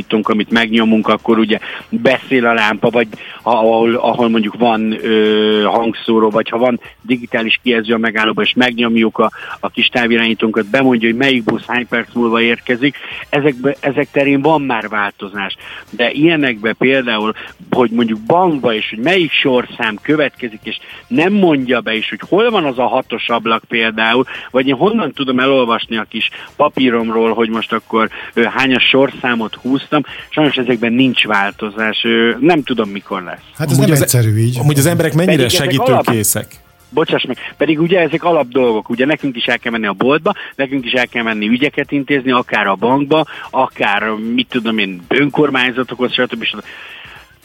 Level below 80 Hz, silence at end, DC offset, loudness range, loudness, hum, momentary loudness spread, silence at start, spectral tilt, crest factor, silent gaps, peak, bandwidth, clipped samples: -52 dBFS; 0.25 s; under 0.1%; 2 LU; -14 LUFS; none; 7 LU; 0 s; -5 dB/octave; 14 dB; none; 0 dBFS; 17 kHz; under 0.1%